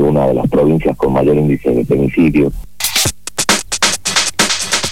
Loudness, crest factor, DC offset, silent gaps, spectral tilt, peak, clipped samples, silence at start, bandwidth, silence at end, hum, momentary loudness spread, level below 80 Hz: -13 LUFS; 14 dB; 2%; none; -3.5 dB/octave; 0 dBFS; under 0.1%; 0 s; 17 kHz; 0 s; none; 3 LU; -32 dBFS